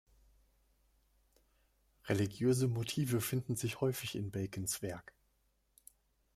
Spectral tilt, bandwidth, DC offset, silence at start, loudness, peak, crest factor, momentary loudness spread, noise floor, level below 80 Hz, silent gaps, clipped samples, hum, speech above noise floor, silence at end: -5.5 dB/octave; 16 kHz; under 0.1%; 2.05 s; -36 LUFS; -20 dBFS; 20 dB; 8 LU; -77 dBFS; -68 dBFS; none; under 0.1%; none; 41 dB; 1.35 s